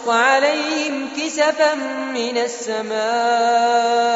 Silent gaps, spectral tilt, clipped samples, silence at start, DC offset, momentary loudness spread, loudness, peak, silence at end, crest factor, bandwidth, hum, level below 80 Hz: none; 0.5 dB/octave; under 0.1%; 0 s; under 0.1%; 9 LU; -18 LUFS; -2 dBFS; 0 s; 16 dB; 8 kHz; none; -70 dBFS